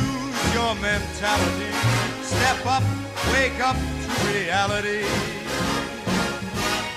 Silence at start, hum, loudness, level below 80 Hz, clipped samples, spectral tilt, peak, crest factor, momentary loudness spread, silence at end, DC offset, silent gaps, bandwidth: 0 s; none; -23 LUFS; -40 dBFS; under 0.1%; -4 dB/octave; -8 dBFS; 16 dB; 5 LU; 0 s; under 0.1%; none; 16 kHz